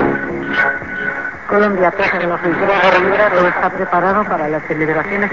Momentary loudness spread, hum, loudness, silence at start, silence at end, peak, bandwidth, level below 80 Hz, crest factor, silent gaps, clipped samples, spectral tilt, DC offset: 8 LU; none; -15 LUFS; 0 s; 0 s; 0 dBFS; 7.6 kHz; -44 dBFS; 14 dB; none; under 0.1%; -7 dB/octave; 0.7%